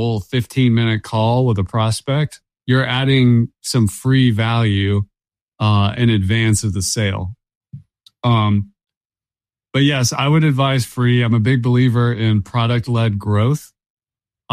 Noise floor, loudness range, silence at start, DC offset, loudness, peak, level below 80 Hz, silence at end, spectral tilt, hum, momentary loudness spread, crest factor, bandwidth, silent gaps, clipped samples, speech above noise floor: under -90 dBFS; 4 LU; 0 s; under 0.1%; -17 LUFS; -4 dBFS; -46 dBFS; 0 s; -6 dB/octave; none; 7 LU; 14 dB; 15 kHz; 5.42-5.47 s, 7.55-7.61 s, 8.97-9.10 s, 13.90-13.97 s; under 0.1%; over 75 dB